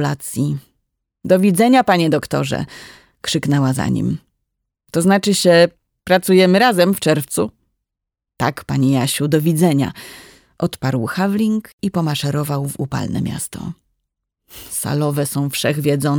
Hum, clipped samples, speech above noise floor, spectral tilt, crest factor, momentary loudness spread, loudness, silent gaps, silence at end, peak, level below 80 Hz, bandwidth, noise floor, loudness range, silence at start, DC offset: none; under 0.1%; 66 dB; -5.5 dB/octave; 16 dB; 13 LU; -17 LUFS; 11.73-11.78 s; 0 s; -2 dBFS; -50 dBFS; over 20 kHz; -83 dBFS; 7 LU; 0 s; under 0.1%